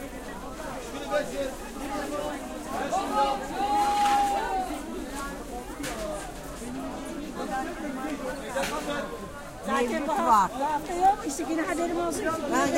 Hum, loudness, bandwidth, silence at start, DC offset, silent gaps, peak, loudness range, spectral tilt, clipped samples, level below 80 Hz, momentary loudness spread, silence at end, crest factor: none; -29 LUFS; 16 kHz; 0 s; under 0.1%; none; -10 dBFS; 8 LU; -3.5 dB/octave; under 0.1%; -46 dBFS; 13 LU; 0 s; 20 dB